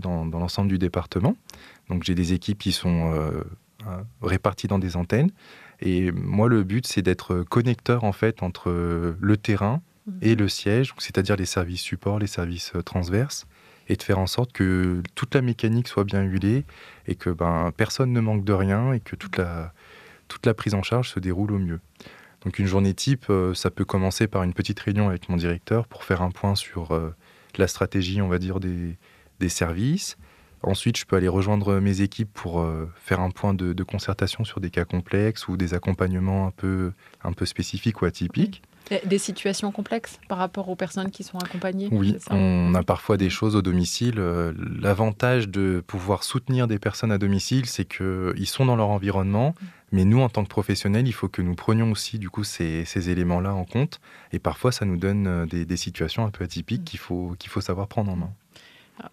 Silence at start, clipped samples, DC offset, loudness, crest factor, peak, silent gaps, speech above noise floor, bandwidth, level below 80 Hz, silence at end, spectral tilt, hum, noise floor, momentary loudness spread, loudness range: 0 s; under 0.1%; under 0.1%; -25 LUFS; 22 dB; -2 dBFS; none; 28 dB; 14.5 kHz; -46 dBFS; 0.05 s; -6 dB/octave; none; -52 dBFS; 8 LU; 4 LU